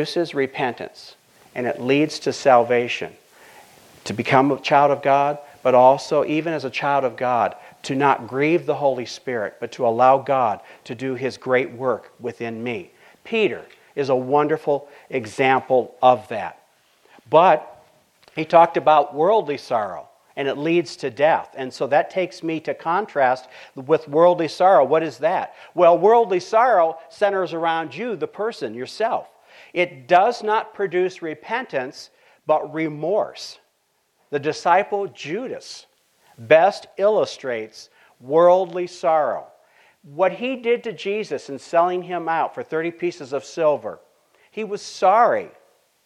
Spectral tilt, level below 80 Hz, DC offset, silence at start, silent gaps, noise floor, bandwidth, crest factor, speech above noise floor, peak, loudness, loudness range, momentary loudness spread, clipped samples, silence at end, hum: -5.5 dB/octave; -72 dBFS; under 0.1%; 0 s; none; -67 dBFS; 12 kHz; 20 dB; 48 dB; 0 dBFS; -20 LUFS; 6 LU; 15 LU; under 0.1%; 0.6 s; none